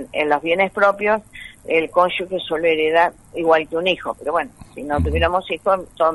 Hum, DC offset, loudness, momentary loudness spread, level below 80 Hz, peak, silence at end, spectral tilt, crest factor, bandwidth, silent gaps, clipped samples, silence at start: none; under 0.1%; -19 LUFS; 7 LU; -36 dBFS; -2 dBFS; 0 s; -6 dB/octave; 18 dB; 11.5 kHz; none; under 0.1%; 0 s